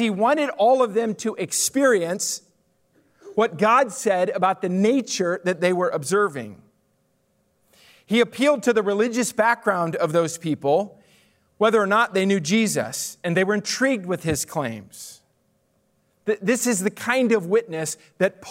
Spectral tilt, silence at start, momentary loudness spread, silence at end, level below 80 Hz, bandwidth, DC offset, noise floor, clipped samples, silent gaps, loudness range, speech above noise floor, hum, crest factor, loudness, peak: -4 dB/octave; 0 s; 9 LU; 0 s; -64 dBFS; 16 kHz; under 0.1%; -67 dBFS; under 0.1%; none; 4 LU; 46 dB; none; 16 dB; -22 LUFS; -6 dBFS